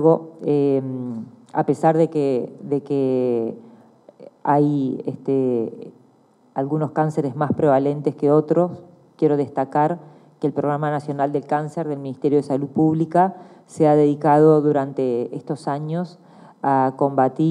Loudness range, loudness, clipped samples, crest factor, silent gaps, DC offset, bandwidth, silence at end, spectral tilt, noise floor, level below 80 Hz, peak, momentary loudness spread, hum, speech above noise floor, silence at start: 5 LU; -20 LUFS; under 0.1%; 16 dB; none; under 0.1%; 10.5 kHz; 0 s; -9 dB/octave; -56 dBFS; -72 dBFS; -4 dBFS; 11 LU; none; 36 dB; 0 s